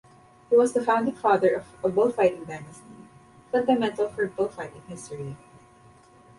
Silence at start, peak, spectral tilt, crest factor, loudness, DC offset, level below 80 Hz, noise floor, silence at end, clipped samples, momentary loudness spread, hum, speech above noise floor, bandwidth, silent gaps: 0.5 s; -8 dBFS; -6 dB/octave; 18 dB; -24 LUFS; under 0.1%; -64 dBFS; -54 dBFS; 1.05 s; under 0.1%; 17 LU; none; 29 dB; 11.5 kHz; none